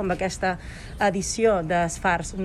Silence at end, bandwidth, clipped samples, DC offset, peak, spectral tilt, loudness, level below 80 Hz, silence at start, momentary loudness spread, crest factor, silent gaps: 0 s; 13.5 kHz; under 0.1%; under 0.1%; -8 dBFS; -4.5 dB/octave; -24 LUFS; -40 dBFS; 0 s; 6 LU; 16 dB; none